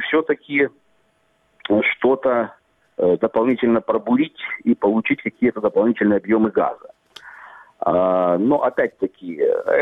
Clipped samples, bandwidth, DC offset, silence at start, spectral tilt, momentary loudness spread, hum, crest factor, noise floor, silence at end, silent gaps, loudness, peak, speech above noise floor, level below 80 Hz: under 0.1%; 5.4 kHz; under 0.1%; 0 s; -8 dB/octave; 8 LU; none; 14 dB; -63 dBFS; 0 s; none; -19 LUFS; -4 dBFS; 44 dB; -60 dBFS